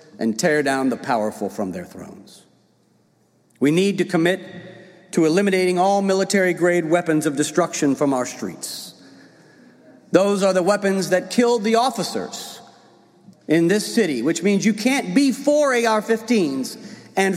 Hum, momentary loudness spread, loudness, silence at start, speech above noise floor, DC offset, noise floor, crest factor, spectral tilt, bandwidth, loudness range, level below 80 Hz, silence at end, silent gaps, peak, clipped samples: none; 13 LU; -20 LUFS; 0.15 s; 41 dB; under 0.1%; -60 dBFS; 20 dB; -5 dB/octave; 16 kHz; 5 LU; -70 dBFS; 0 s; none; 0 dBFS; under 0.1%